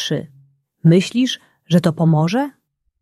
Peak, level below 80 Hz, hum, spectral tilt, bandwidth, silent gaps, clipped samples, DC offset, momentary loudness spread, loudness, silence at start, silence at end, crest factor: -2 dBFS; -60 dBFS; none; -6.5 dB/octave; 12.5 kHz; none; under 0.1%; under 0.1%; 11 LU; -17 LUFS; 0 s; 0.5 s; 16 dB